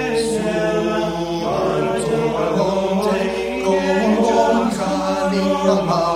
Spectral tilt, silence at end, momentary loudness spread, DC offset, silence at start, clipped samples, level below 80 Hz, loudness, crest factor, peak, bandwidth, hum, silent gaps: -5.5 dB/octave; 0 s; 5 LU; under 0.1%; 0 s; under 0.1%; -44 dBFS; -18 LUFS; 14 dB; -4 dBFS; 15.5 kHz; none; none